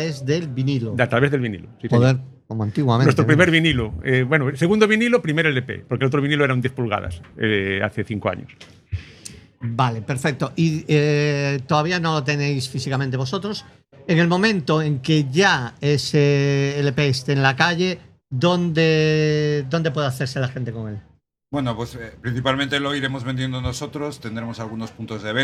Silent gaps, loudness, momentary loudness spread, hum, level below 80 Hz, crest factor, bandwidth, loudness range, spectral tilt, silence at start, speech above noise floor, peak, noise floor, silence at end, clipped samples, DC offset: none; -20 LUFS; 13 LU; none; -48 dBFS; 20 dB; 13 kHz; 7 LU; -6 dB/octave; 0 s; 22 dB; 0 dBFS; -42 dBFS; 0 s; under 0.1%; under 0.1%